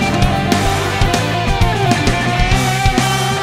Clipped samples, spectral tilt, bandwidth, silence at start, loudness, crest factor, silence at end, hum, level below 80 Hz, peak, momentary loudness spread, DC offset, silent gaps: under 0.1%; -4.5 dB/octave; 16 kHz; 0 s; -15 LUFS; 14 dB; 0 s; none; -22 dBFS; 0 dBFS; 2 LU; under 0.1%; none